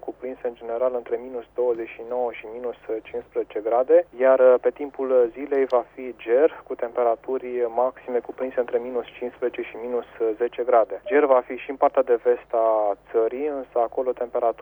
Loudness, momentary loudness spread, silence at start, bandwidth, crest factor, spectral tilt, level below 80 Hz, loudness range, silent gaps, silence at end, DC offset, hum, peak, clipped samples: -23 LUFS; 13 LU; 0.05 s; 18.5 kHz; 18 dB; -7 dB/octave; -62 dBFS; 6 LU; none; 0 s; under 0.1%; none; -6 dBFS; under 0.1%